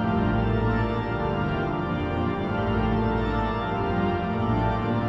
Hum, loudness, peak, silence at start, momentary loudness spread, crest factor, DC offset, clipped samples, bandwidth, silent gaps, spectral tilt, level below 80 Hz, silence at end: none; -26 LUFS; -12 dBFS; 0 s; 3 LU; 12 dB; under 0.1%; under 0.1%; 6 kHz; none; -9 dB/octave; -36 dBFS; 0 s